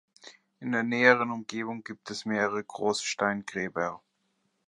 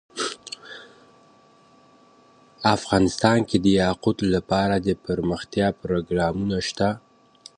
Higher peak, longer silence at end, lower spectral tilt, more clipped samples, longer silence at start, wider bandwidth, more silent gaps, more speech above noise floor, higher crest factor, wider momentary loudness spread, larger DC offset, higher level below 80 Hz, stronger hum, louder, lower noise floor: about the same, -6 dBFS vs -4 dBFS; about the same, 0.7 s vs 0.6 s; second, -4 dB/octave vs -5.5 dB/octave; neither; about the same, 0.25 s vs 0.15 s; first, 11.5 kHz vs 10 kHz; neither; first, 46 dB vs 33 dB; about the same, 24 dB vs 20 dB; about the same, 15 LU vs 14 LU; neither; second, -72 dBFS vs -46 dBFS; neither; second, -28 LUFS vs -23 LUFS; first, -75 dBFS vs -55 dBFS